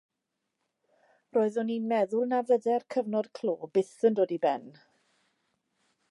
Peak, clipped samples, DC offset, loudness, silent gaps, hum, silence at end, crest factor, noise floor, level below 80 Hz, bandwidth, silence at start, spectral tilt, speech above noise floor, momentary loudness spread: -12 dBFS; under 0.1%; under 0.1%; -29 LUFS; none; none; 1.4 s; 18 dB; -84 dBFS; -86 dBFS; 11 kHz; 1.35 s; -6.5 dB/octave; 56 dB; 6 LU